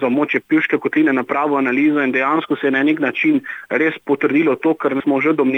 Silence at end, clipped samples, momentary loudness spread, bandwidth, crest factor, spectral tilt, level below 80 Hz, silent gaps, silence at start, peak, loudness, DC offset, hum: 0 s; under 0.1%; 3 LU; 6 kHz; 12 dB; -7.5 dB/octave; -70 dBFS; none; 0 s; -4 dBFS; -17 LUFS; under 0.1%; none